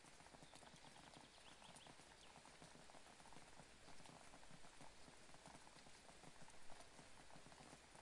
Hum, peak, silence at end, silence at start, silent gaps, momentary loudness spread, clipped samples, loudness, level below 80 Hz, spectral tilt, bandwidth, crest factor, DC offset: none; -44 dBFS; 0 s; 0 s; none; 2 LU; under 0.1%; -64 LUFS; -78 dBFS; -2.5 dB/octave; 12 kHz; 18 dB; under 0.1%